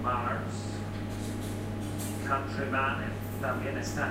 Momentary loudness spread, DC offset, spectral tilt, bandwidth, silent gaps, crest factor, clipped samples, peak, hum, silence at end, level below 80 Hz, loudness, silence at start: 7 LU; under 0.1%; -5.5 dB/octave; 16 kHz; none; 16 dB; under 0.1%; -16 dBFS; none; 0 s; -48 dBFS; -33 LUFS; 0 s